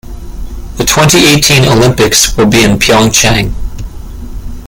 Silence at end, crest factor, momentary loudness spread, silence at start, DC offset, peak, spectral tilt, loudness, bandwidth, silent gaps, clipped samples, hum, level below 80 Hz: 0 s; 8 dB; 22 LU; 0.05 s; under 0.1%; 0 dBFS; -3.5 dB/octave; -6 LUFS; over 20 kHz; none; 0.5%; none; -22 dBFS